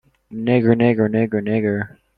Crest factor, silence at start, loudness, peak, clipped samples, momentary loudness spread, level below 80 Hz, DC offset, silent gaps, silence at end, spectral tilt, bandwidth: 16 dB; 0.3 s; -18 LUFS; -2 dBFS; under 0.1%; 10 LU; -54 dBFS; under 0.1%; none; 0.3 s; -10.5 dB/octave; 4.7 kHz